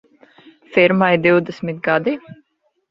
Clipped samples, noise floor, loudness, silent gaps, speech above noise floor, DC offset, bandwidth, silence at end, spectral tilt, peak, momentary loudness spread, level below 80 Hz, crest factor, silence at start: under 0.1%; -65 dBFS; -16 LUFS; none; 49 dB; under 0.1%; 6.2 kHz; 0.6 s; -8 dB/octave; -2 dBFS; 11 LU; -60 dBFS; 18 dB; 0.7 s